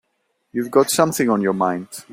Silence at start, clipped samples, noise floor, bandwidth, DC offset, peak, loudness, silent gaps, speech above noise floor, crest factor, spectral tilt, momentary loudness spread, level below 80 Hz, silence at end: 0.55 s; under 0.1%; -70 dBFS; 16.5 kHz; under 0.1%; -2 dBFS; -19 LUFS; none; 52 dB; 18 dB; -4.5 dB/octave; 11 LU; -62 dBFS; 0 s